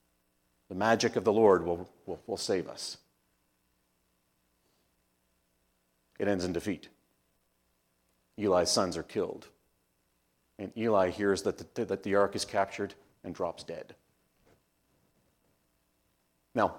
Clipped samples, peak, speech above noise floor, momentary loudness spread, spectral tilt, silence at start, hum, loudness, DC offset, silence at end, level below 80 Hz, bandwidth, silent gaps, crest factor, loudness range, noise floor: under 0.1%; -10 dBFS; 45 dB; 17 LU; -4.5 dB/octave; 0.7 s; none; -31 LUFS; under 0.1%; 0 s; -70 dBFS; 16.5 kHz; none; 24 dB; 13 LU; -75 dBFS